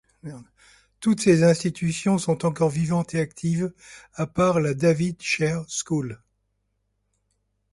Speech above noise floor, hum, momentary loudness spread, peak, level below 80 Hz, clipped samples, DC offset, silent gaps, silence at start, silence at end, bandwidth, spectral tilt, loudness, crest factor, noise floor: 51 dB; 50 Hz at -55 dBFS; 13 LU; -6 dBFS; -56 dBFS; under 0.1%; under 0.1%; none; 0.25 s; 1.55 s; 11.5 kHz; -6 dB/octave; -23 LUFS; 18 dB; -74 dBFS